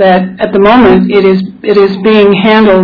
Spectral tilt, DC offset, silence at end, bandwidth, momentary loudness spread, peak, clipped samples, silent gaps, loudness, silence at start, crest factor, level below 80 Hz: -8.5 dB/octave; under 0.1%; 0 s; 5.4 kHz; 6 LU; 0 dBFS; 4%; none; -6 LUFS; 0 s; 6 dB; -34 dBFS